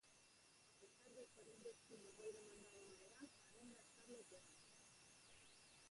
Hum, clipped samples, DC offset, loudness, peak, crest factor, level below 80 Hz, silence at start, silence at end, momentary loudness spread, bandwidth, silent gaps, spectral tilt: none; under 0.1%; under 0.1%; -63 LUFS; -44 dBFS; 20 dB; -90 dBFS; 0.05 s; 0 s; 10 LU; 11.5 kHz; none; -2.5 dB/octave